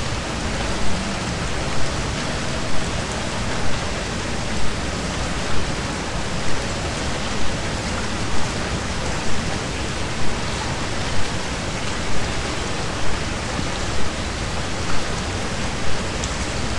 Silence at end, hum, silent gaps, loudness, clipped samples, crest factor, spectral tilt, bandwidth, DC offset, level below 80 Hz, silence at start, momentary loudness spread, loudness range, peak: 0 s; none; none; -25 LUFS; under 0.1%; 14 dB; -4 dB/octave; 11.5 kHz; 4%; -32 dBFS; 0 s; 1 LU; 0 LU; -6 dBFS